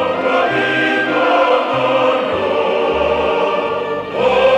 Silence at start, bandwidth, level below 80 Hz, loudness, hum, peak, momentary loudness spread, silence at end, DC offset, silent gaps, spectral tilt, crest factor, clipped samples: 0 s; 9 kHz; -46 dBFS; -15 LUFS; none; -2 dBFS; 4 LU; 0 s; under 0.1%; none; -5 dB/octave; 12 dB; under 0.1%